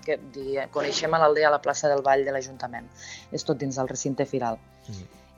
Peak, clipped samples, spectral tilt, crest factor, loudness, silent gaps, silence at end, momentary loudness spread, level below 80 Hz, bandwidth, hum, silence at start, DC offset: -6 dBFS; under 0.1%; -4 dB/octave; 20 dB; -25 LUFS; none; 0.3 s; 20 LU; -60 dBFS; 8.8 kHz; none; 0.05 s; under 0.1%